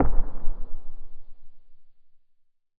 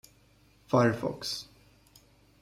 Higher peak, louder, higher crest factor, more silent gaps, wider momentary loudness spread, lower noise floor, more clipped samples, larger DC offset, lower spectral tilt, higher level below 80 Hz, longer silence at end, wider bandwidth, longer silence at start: first, -6 dBFS vs -12 dBFS; second, -36 LUFS vs -29 LUFS; second, 16 dB vs 22 dB; neither; first, 22 LU vs 13 LU; about the same, -60 dBFS vs -62 dBFS; neither; neither; first, -11 dB/octave vs -5.5 dB/octave; first, -30 dBFS vs -64 dBFS; about the same, 0.9 s vs 0.95 s; second, 1.7 kHz vs 16 kHz; second, 0 s vs 0.7 s